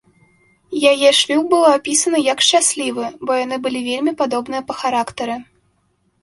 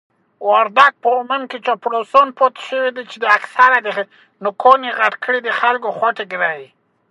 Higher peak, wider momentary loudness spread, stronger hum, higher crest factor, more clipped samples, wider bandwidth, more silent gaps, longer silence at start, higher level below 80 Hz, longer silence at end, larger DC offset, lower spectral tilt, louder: about the same, -2 dBFS vs 0 dBFS; about the same, 12 LU vs 11 LU; neither; about the same, 16 dB vs 16 dB; neither; about the same, 11.5 kHz vs 11.5 kHz; neither; first, 0.7 s vs 0.4 s; about the same, -62 dBFS vs -64 dBFS; first, 0.8 s vs 0.45 s; neither; second, -1 dB/octave vs -3.5 dB/octave; about the same, -16 LUFS vs -16 LUFS